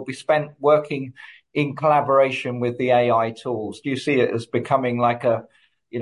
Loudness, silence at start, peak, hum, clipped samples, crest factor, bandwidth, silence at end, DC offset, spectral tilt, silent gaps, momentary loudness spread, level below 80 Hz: -21 LUFS; 0 s; -4 dBFS; none; under 0.1%; 16 dB; 11.5 kHz; 0 s; under 0.1%; -6.5 dB/octave; none; 10 LU; -64 dBFS